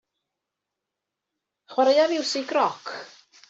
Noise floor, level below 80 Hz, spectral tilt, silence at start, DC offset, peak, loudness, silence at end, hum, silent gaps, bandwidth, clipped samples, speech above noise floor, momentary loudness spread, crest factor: -85 dBFS; -82 dBFS; -2.5 dB/octave; 1.7 s; under 0.1%; -8 dBFS; -23 LUFS; 0.45 s; 50 Hz at -80 dBFS; none; 8.2 kHz; under 0.1%; 62 dB; 17 LU; 18 dB